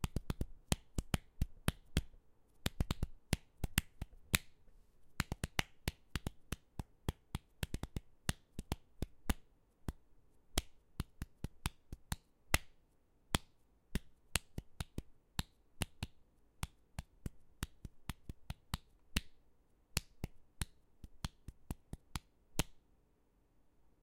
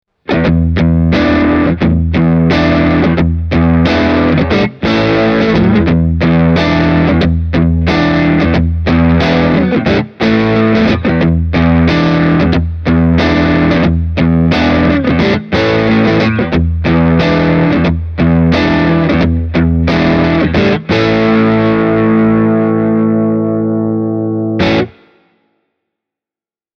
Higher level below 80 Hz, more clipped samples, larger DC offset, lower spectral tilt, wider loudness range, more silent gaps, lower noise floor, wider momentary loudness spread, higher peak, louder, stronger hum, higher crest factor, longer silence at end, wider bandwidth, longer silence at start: second, -50 dBFS vs -24 dBFS; neither; neither; second, -3.5 dB/octave vs -8 dB/octave; first, 7 LU vs 1 LU; neither; second, -73 dBFS vs under -90 dBFS; first, 13 LU vs 3 LU; second, -8 dBFS vs 0 dBFS; second, -44 LUFS vs -11 LUFS; neither; first, 36 dB vs 10 dB; second, 1.25 s vs 1.9 s; first, 16.5 kHz vs 6.6 kHz; second, 0 s vs 0.3 s